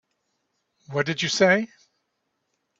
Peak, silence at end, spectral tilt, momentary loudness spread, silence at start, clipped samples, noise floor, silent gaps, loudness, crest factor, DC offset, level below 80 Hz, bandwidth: -6 dBFS; 1.15 s; -4 dB/octave; 12 LU; 0.9 s; under 0.1%; -77 dBFS; none; -22 LUFS; 22 dB; under 0.1%; -68 dBFS; 8 kHz